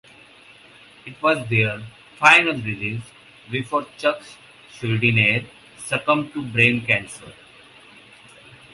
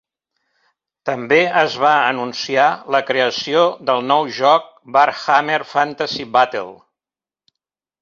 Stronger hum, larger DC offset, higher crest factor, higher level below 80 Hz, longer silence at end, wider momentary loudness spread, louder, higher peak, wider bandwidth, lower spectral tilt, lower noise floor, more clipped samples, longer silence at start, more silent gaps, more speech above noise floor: neither; neither; about the same, 22 dB vs 18 dB; first, -58 dBFS vs -66 dBFS; first, 1.4 s vs 1.25 s; first, 20 LU vs 8 LU; second, -19 LUFS vs -16 LUFS; about the same, 0 dBFS vs 0 dBFS; first, 11.5 kHz vs 7.4 kHz; about the same, -5 dB/octave vs -4 dB/octave; second, -48 dBFS vs under -90 dBFS; neither; about the same, 1.05 s vs 1.05 s; neither; second, 27 dB vs over 74 dB